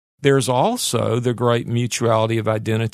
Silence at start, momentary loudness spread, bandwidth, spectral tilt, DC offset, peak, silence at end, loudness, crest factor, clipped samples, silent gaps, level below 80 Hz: 0.2 s; 4 LU; 13.5 kHz; -5 dB/octave; under 0.1%; -2 dBFS; 0.05 s; -19 LUFS; 16 dB; under 0.1%; none; -58 dBFS